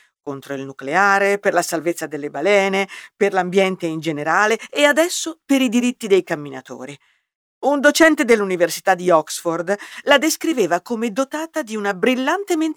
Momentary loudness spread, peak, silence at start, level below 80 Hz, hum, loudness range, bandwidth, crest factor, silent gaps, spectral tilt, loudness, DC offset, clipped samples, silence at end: 12 LU; 0 dBFS; 0.25 s; -66 dBFS; none; 3 LU; over 20 kHz; 18 dB; 7.35-7.61 s; -3.5 dB/octave; -18 LUFS; under 0.1%; under 0.1%; 0 s